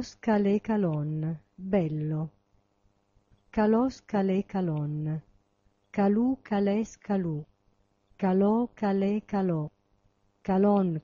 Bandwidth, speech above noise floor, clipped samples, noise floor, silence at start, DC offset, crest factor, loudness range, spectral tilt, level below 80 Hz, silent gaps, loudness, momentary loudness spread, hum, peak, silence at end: 7.2 kHz; 43 dB; under 0.1%; -70 dBFS; 0 s; under 0.1%; 14 dB; 2 LU; -8 dB/octave; -60 dBFS; none; -28 LUFS; 10 LU; none; -14 dBFS; 0 s